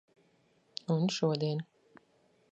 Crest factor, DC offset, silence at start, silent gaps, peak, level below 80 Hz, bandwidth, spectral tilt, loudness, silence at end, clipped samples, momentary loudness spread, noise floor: 20 dB; under 0.1%; 0.9 s; none; -16 dBFS; -80 dBFS; 8.2 kHz; -6 dB/octave; -33 LUFS; 0.9 s; under 0.1%; 15 LU; -70 dBFS